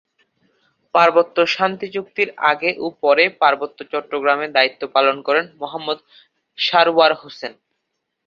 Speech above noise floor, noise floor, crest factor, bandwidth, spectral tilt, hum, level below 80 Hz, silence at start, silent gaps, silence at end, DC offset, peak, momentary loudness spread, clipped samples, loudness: 58 dB; -76 dBFS; 18 dB; 7.2 kHz; -4 dB/octave; none; -70 dBFS; 0.95 s; none; 0.75 s; under 0.1%; -2 dBFS; 13 LU; under 0.1%; -17 LUFS